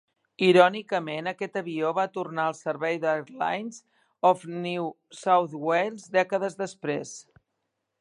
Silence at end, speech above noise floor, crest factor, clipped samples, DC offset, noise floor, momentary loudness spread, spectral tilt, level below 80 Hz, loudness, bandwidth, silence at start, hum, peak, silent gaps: 0.8 s; 54 dB; 24 dB; under 0.1%; under 0.1%; -80 dBFS; 12 LU; -5 dB/octave; -80 dBFS; -26 LUFS; 11 kHz; 0.4 s; none; -4 dBFS; none